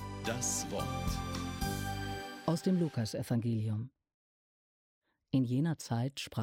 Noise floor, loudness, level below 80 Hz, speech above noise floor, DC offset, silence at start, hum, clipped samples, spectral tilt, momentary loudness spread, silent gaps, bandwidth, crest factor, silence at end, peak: under -90 dBFS; -35 LUFS; -52 dBFS; over 56 dB; under 0.1%; 0 s; none; under 0.1%; -5 dB/octave; 7 LU; 4.14-5.02 s; 16.5 kHz; 16 dB; 0 s; -20 dBFS